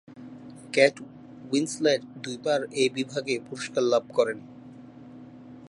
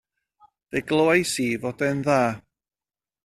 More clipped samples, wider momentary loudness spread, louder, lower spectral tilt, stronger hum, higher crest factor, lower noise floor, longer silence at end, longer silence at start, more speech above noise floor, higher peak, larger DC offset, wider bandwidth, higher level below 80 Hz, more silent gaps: neither; first, 24 LU vs 11 LU; second, -26 LUFS vs -23 LUFS; about the same, -4 dB/octave vs -5 dB/octave; neither; about the same, 22 dB vs 20 dB; second, -46 dBFS vs under -90 dBFS; second, 0.05 s vs 0.85 s; second, 0.1 s vs 0.75 s; second, 20 dB vs over 68 dB; about the same, -6 dBFS vs -6 dBFS; neither; second, 11.5 kHz vs 14.5 kHz; second, -72 dBFS vs -60 dBFS; neither